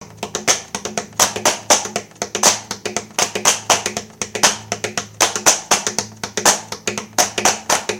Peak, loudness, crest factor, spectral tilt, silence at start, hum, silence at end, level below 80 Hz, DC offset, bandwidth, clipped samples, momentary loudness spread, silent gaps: 0 dBFS; -17 LUFS; 20 dB; -0.5 dB/octave; 0 s; none; 0 s; -54 dBFS; under 0.1%; over 20 kHz; under 0.1%; 11 LU; none